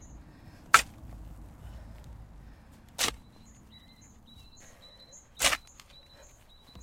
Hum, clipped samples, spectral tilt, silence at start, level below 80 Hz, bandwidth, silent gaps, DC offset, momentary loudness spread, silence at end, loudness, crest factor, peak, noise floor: none; under 0.1%; -0.5 dB/octave; 0 s; -52 dBFS; 16 kHz; none; under 0.1%; 29 LU; 0.05 s; -27 LUFS; 34 dB; -2 dBFS; -56 dBFS